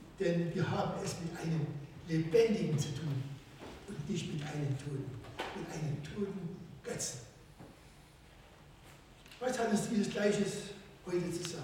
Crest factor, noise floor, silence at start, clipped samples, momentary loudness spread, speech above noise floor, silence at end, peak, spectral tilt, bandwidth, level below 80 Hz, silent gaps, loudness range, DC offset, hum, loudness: 20 dB; -58 dBFS; 0 s; under 0.1%; 21 LU; 23 dB; 0 s; -18 dBFS; -5.5 dB/octave; 16.5 kHz; -62 dBFS; none; 8 LU; under 0.1%; none; -36 LUFS